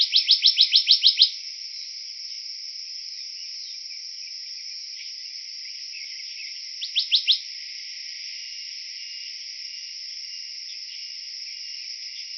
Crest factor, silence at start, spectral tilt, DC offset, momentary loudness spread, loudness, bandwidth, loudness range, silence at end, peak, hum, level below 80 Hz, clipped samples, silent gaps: 24 dB; 0 s; 8 dB/octave; under 0.1%; 17 LU; -24 LUFS; 6.4 kHz; 12 LU; 0 s; -2 dBFS; none; -82 dBFS; under 0.1%; none